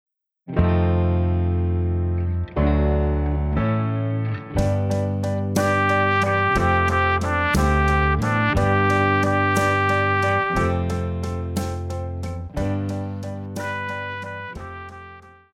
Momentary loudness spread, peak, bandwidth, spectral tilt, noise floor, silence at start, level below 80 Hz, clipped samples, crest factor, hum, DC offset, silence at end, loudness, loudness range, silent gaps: 11 LU; -4 dBFS; 14.5 kHz; -6.5 dB/octave; -44 dBFS; 0.45 s; -30 dBFS; under 0.1%; 16 dB; none; under 0.1%; 0.25 s; -21 LUFS; 9 LU; none